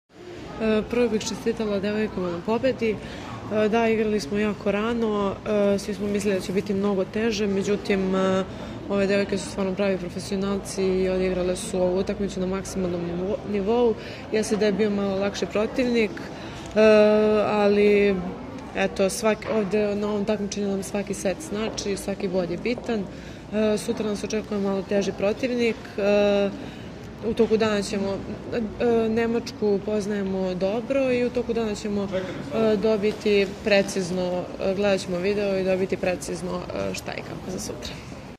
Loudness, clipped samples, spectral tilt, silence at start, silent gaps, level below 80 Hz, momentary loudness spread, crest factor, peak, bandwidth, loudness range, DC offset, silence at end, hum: -24 LUFS; under 0.1%; -5.5 dB/octave; 0.15 s; none; -48 dBFS; 9 LU; 20 dB; -4 dBFS; 14.5 kHz; 5 LU; under 0.1%; 0 s; none